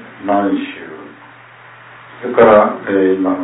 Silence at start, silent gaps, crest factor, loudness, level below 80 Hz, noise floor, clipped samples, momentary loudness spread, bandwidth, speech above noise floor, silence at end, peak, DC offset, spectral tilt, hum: 0 s; none; 16 dB; -13 LUFS; -52 dBFS; -40 dBFS; under 0.1%; 22 LU; 4 kHz; 27 dB; 0 s; 0 dBFS; under 0.1%; -10.5 dB/octave; none